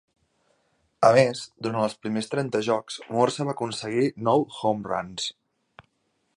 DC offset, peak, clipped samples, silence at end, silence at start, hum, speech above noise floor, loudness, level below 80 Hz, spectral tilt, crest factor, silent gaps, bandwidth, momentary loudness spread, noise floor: under 0.1%; -4 dBFS; under 0.1%; 1.05 s; 1 s; none; 48 dB; -25 LUFS; -66 dBFS; -5 dB/octave; 22 dB; none; 11.5 kHz; 11 LU; -73 dBFS